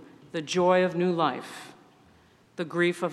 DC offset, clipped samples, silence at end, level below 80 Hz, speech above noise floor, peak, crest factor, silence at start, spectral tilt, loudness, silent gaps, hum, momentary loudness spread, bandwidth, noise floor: under 0.1%; under 0.1%; 0 s; -72 dBFS; 33 dB; -10 dBFS; 18 dB; 0 s; -5.5 dB/octave; -26 LUFS; none; none; 19 LU; 12.5 kHz; -59 dBFS